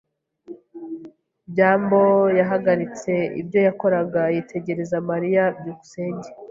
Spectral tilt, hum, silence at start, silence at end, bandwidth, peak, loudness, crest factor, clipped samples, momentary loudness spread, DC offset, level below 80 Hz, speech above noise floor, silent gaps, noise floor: -7.5 dB/octave; none; 0.5 s; 0 s; 7.6 kHz; -4 dBFS; -21 LUFS; 18 dB; under 0.1%; 18 LU; under 0.1%; -64 dBFS; 25 dB; none; -45 dBFS